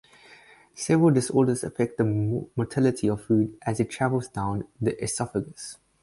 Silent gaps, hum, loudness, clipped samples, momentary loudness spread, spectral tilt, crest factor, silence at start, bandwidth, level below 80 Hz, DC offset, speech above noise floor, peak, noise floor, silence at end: none; none; -26 LUFS; under 0.1%; 10 LU; -6.5 dB/octave; 16 dB; 0.75 s; 11.5 kHz; -54 dBFS; under 0.1%; 28 dB; -10 dBFS; -53 dBFS; 0.3 s